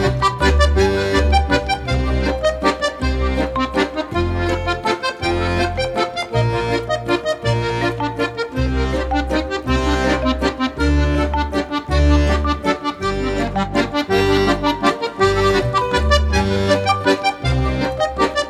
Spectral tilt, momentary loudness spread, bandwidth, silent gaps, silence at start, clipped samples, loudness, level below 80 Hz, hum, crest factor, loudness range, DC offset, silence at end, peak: -5.5 dB/octave; 5 LU; 12.5 kHz; none; 0 s; under 0.1%; -18 LUFS; -24 dBFS; none; 14 dB; 3 LU; under 0.1%; 0 s; -2 dBFS